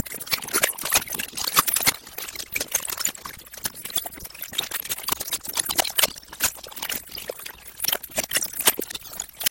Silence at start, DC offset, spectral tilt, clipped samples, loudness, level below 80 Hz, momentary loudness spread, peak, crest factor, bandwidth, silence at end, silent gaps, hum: 0 s; under 0.1%; 0 dB/octave; under 0.1%; -24 LUFS; -54 dBFS; 13 LU; 0 dBFS; 28 dB; 17.5 kHz; 0 s; none; none